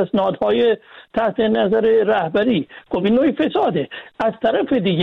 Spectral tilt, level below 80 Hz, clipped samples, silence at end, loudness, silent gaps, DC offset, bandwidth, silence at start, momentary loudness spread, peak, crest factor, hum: -8.5 dB/octave; -54 dBFS; under 0.1%; 0 s; -18 LUFS; none; under 0.1%; 5.2 kHz; 0 s; 8 LU; -6 dBFS; 12 dB; none